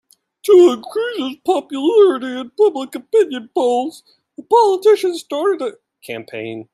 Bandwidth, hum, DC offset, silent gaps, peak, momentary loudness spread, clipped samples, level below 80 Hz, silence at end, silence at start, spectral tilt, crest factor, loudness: 13.5 kHz; none; under 0.1%; none; -2 dBFS; 15 LU; under 0.1%; -70 dBFS; 0.1 s; 0.45 s; -4.5 dB/octave; 14 dB; -16 LUFS